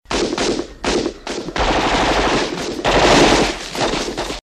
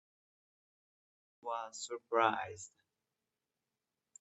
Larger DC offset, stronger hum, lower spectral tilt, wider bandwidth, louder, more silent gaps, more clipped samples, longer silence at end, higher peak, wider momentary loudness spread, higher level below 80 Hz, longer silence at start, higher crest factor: neither; neither; about the same, -3.5 dB/octave vs -3 dB/octave; first, 14 kHz vs 8.4 kHz; first, -17 LUFS vs -37 LUFS; neither; neither; second, 0.05 s vs 1.55 s; first, 0 dBFS vs -16 dBFS; second, 11 LU vs 18 LU; first, -30 dBFS vs -88 dBFS; second, 0.1 s vs 1.45 s; second, 16 dB vs 26 dB